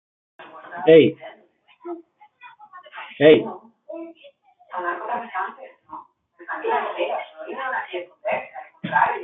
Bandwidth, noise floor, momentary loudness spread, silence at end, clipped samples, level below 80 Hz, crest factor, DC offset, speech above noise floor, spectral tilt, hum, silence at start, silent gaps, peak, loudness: 4 kHz; -55 dBFS; 27 LU; 0 s; under 0.1%; -70 dBFS; 22 dB; under 0.1%; 37 dB; -10 dB/octave; none; 0.4 s; none; -2 dBFS; -21 LUFS